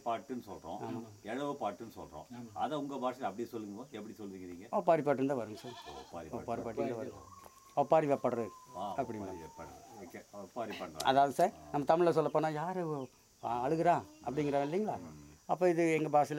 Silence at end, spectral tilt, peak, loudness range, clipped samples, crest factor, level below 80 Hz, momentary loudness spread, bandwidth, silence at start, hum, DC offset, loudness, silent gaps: 0 s; -6 dB/octave; -14 dBFS; 8 LU; under 0.1%; 22 dB; -70 dBFS; 19 LU; 16 kHz; 0.05 s; none; under 0.1%; -35 LUFS; none